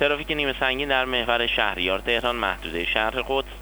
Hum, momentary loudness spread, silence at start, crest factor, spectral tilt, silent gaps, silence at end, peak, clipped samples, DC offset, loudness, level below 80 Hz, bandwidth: 50 Hz at -40 dBFS; 4 LU; 0 s; 18 dB; -4 dB/octave; none; 0 s; -6 dBFS; under 0.1%; under 0.1%; -23 LUFS; -40 dBFS; over 20 kHz